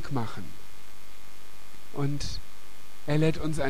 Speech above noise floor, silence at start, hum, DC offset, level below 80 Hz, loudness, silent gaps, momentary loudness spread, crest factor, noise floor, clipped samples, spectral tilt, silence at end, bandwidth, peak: 23 dB; 0 s; 50 Hz at -55 dBFS; 5%; -46 dBFS; -31 LUFS; none; 24 LU; 18 dB; -52 dBFS; under 0.1%; -6 dB/octave; 0 s; 15.5 kHz; -12 dBFS